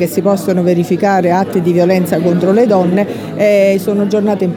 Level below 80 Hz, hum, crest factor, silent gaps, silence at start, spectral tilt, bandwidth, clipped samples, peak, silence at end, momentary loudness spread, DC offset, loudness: -56 dBFS; none; 10 dB; none; 0 s; -7 dB/octave; 19 kHz; under 0.1%; 0 dBFS; 0 s; 4 LU; under 0.1%; -12 LUFS